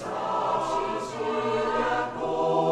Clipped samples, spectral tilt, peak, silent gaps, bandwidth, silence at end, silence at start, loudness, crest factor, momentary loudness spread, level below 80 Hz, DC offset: under 0.1%; -5 dB/octave; -12 dBFS; none; 12 kHz; 0 s; 0 s; -27 LUFS; 14 dB; 4 LU; -54 dBFS; under 0.1%